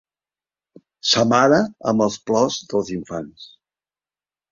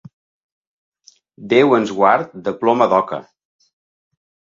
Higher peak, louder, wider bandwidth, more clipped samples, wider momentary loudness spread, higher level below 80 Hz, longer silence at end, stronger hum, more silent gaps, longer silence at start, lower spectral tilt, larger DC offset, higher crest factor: about the same, -2 dBFS vs 0 dBFS; second, -19 LUFS vs -16 LUFS; about the same, 7.6 kHz vs 7.6 kHz; neither; first, 15 LU vs 12 LU; about the same, -58 dBFS vs -62 dBFS; second, 1.05 s vs 1.3 s; first, 50 Hz at -50 dBFS vs none; neither; second, 1.05 s vs 1.4 s; second, -4 dB/octave vs -6 dB/octave; neither; about the same, 20 dB vs 20 dB